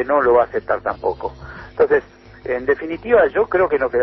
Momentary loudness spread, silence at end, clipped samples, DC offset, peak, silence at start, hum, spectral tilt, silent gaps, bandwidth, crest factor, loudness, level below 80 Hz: 15 LU; 0 s; under 0.1%; under 0.1%; -2 dBFS; 0 s; none; -8.5 dB/octave; none; 5.8 kHz; 16 dB; -18 LUFS; -44 dBFS